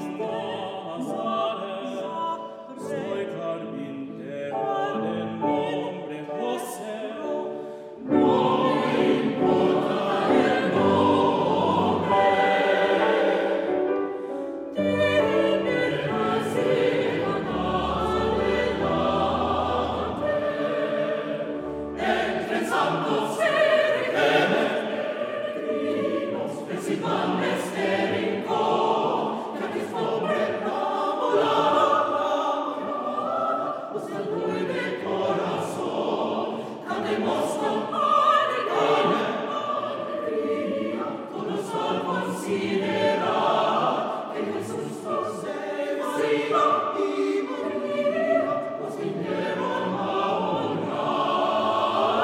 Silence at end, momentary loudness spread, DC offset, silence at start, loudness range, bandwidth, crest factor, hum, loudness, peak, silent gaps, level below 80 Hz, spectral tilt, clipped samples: 0 s; 10 LU; under 0.1%; 0 s; 7 LU; 15.5 kHz; 18 dB; none; -25 LUFS; -8 dBFS; none; -56 dBFS; -5.5 dB/octave; under 0.1%